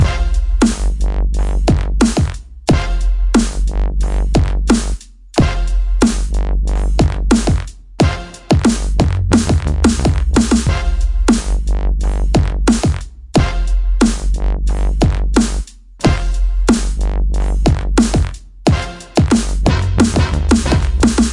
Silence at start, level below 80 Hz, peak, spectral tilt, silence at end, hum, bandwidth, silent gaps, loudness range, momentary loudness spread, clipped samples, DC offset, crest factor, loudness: 0 s; -16 dBFS; 0 dBFS; -6 dB/octave; 0 s; none; 11.5 kHz; none; 2 LU; 6 LU; under 0.1%; under 0.1%; 14 dB; -16 LUFS